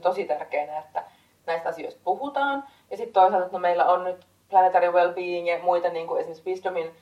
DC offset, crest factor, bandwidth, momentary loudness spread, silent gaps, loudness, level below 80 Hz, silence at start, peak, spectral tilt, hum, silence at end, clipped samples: under 0.1%; 18 dB; 11 kHz; 13 LU; none; -24 LUFS; -76 dBFS; 0 s; -6 dBFS; -5.5 dB/octave; none; 0.1 s; under 0.1%